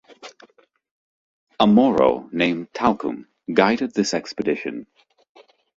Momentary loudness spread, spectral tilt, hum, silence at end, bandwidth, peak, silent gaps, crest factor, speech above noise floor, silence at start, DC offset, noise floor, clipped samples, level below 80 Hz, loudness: 13 LU; -5.5 dB/octave; none; 0.95 s; 7.8 kHz; 0 dBFS; 0.91-1.47 s; 22 dB; 36 dB; 0.25 s; under 0.1%; -55 dBFS; under 0.1%; -56 dBFS; -20 LUFS